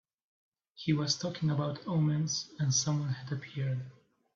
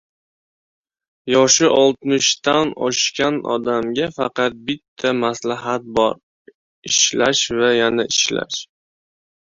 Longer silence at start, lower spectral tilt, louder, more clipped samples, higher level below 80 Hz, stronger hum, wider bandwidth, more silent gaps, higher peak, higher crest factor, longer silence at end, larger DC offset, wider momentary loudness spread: second, 0.8 s vs 1.25 s; first, -4.5 dB/octave vs -2 dB/octave; second, -32 LUFS vs -17 LUFS; neither; second, -70 dBFS vs -58 dBFS; neither; about the same, 7.6 kHz vs 7.8 kHz; second, none vs 4.88-4.96 s, 6.23-6.45 s, 6.55-6.82 s; second, -16 dBFS vs 0 dBFS; about the same, 18 dB vs 18 dB; second, 0.45 s vs 0.9 s; neither; about the same, 9 LU vs 10 LU